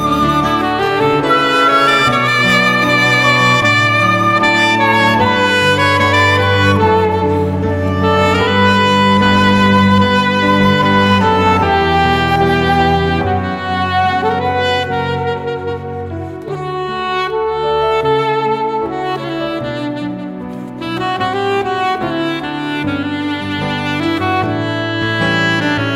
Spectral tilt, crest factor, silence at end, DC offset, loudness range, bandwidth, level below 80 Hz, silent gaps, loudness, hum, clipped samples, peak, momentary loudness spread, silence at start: -5.5 dB/octave; 12 dB; 0 s; under 0.1%; 8 LU; 16 kHz; -38 dBFS; none; -13 LUFS; none; under 0.1%; 0 dBFS; 10 LU; 0 s